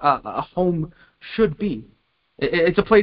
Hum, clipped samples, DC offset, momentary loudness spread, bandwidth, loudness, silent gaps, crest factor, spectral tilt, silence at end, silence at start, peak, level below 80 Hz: none; under 0.1%; under 0.1%; 14 LU; 5.4 kHz; -22 LUFS; none; 20 dB; -11 dB/octave; 0 s; 0 s; -2 dBFS; -46 dBFS